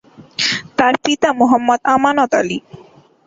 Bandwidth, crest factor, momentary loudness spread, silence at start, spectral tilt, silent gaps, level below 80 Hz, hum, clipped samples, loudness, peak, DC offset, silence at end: 8 kHz; 14 dB; 7 LU; 0.2 s; -3.5 dB/octave; none; -56 dBFS; none; under 0.1%; -15 LUFS; -2 dBFS; under 0.1%; 0.5 s